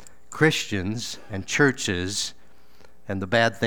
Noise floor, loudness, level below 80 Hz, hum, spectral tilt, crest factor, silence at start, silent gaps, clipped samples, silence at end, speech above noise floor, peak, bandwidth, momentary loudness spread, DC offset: -56 dBFS; -24 LUFS; -56 dBFS; none; -4 dB/octave; 22 dB; 0.3 s; none; under 0.1%; 0 s; 32 dB; -4 dBFS; 18.5 kHz; 13 LU; 1%